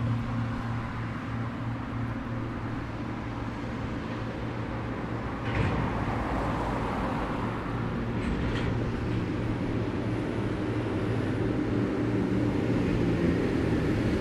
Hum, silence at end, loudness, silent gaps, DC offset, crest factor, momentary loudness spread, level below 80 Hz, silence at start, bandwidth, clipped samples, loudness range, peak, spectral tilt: none; 0 s; -30 LUFS; none; under 0.1%; 16 dB; 7 LU; -40 dBFS; 0 s; 11 kHz; under 0.1%; 6 LU; -14 dBFS; -8 dB/octave